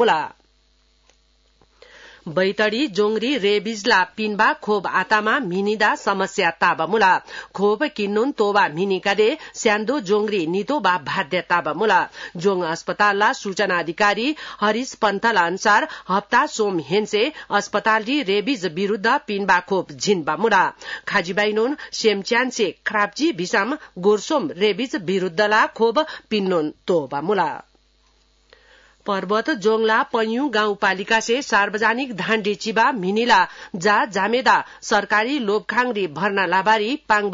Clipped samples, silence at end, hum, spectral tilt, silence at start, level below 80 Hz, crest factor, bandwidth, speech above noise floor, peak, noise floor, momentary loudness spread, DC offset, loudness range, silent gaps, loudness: under 0.1%; 0 s; none; -4 dB/octave; 0 s; -62 dBFS; 16 dB; 7.8 kHz; 40 dB; -4 dBFS; -60 dBFS; 6 LU; under 0.1%; 3 LU; none; -20 LUFS